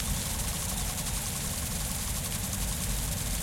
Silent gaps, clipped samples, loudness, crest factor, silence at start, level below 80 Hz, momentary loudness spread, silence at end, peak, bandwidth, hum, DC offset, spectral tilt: none; under 0.1%; -31 LUFS; 16 dB; 0 s; -38 dBFS; 1 LU; 0 s; -16 dBFS; 16.5 kHz; none; under 0.1%; -3 dB/octave